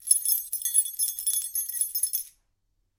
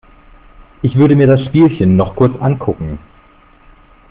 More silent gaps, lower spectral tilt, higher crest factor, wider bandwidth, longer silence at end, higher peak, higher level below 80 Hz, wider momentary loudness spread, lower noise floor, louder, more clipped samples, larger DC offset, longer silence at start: neither; second, 5.5 dB/octave vs -8.5 dB/octave; first, 24 dB vs 12 dB; first, 17 kHz vs 4.7 kHz; second, 0.7 s vs 1.15 s; about the same, -4 dBFS vs -2 dBFS; second, -72 dBFS vs -38 dBFS; second, 7 LU vs 13 LU; first, -73 dBFS vs -45 dBFS; second, -25 LUFS vs -12 LUFS; neither; neither; second, 0 s vs 0.85 s